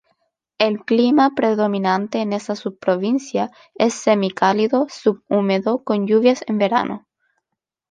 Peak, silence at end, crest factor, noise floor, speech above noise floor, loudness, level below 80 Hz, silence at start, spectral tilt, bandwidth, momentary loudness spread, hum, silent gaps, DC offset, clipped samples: -2 dBFS; 0.9 s; 16 dB; -81 dBFS; 63 dB; -19 LUFS; -68 dBFS; 0.6 s; -5.5 dB/octave; 9.4 kHz; 8 LU; none; none; under 0.1%; under 0.1%